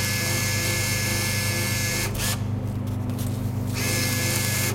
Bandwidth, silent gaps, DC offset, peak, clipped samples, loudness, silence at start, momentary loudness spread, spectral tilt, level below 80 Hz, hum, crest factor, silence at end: 17 kHz; none; under 0.1%; -8 dBFS; under 0.1%; -24 LUFS; 0 s; 6 LU; -3.5 dB/octave; -42 dBFS; 50 Hz at -30 dBFS; 16 dB; 0 s